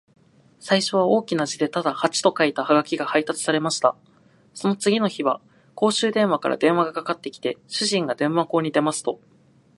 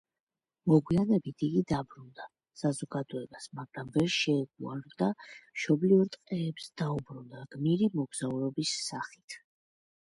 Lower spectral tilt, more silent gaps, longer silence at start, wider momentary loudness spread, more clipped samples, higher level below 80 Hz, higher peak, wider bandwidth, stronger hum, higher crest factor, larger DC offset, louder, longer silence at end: second, -4 dB/octave vs -6 dB/octave; second, none vs 9.24-9.28 s; about the same, 0.65 s vs 0.65 s; second, 8 LU vs 20 LU; neither; second, -72 dBFS vs -64 dBFS; first, -2 dBFS vs -12 dBFS; about the same, 11.5 kHz vs 11.5 kHz; neither; about the same, 20 dB vs 20 dB; neither; first, -22 LUFS vs -31 LUFS; about the same, 0.6 s vs 0.7 s